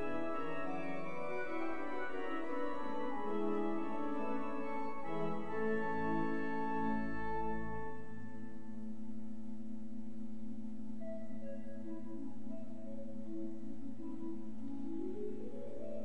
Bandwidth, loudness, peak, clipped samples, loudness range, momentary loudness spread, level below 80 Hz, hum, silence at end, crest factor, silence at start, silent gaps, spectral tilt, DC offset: 9.6 kHz; -43 LUFS; -24 dBFS; under 0.1%; 8 LU; 11 LU; -64 dBFS; none; 0 s; 16 dB; 0 s; none; -7.5 dB/octave; 1%